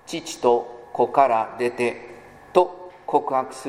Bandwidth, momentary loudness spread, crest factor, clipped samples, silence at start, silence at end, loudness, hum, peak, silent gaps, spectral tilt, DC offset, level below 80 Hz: 15.5 kHz; 14 LU; 22 dB; under 0.1%; 0.1 s; 0 s; -22 LUFS; none; 0 dBFS; none; -4.5 dB/octave; under 0.1%; -64 dBFS